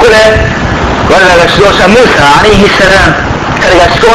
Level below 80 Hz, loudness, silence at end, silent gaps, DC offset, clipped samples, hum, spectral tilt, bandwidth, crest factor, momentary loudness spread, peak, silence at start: -18 dBFS; -4 LUFS; 0 s; none; under 0.1%; 6%; none; -4.5 dB/octave; 16 kHz; 4 dB; 7 LU; 0 dBFS; 0 s